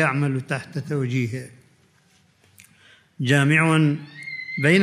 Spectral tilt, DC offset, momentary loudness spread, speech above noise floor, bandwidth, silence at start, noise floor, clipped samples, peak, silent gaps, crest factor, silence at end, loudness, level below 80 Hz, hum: -6 dB/octave; under 0.1%; 15 LU; 38 dB; 13.5 kHz; 0 s; -60 dBFS; under 0.1%; -4 dBFS; none; 18 dB; 0 s; -22 LUFS; -68 dBFS; none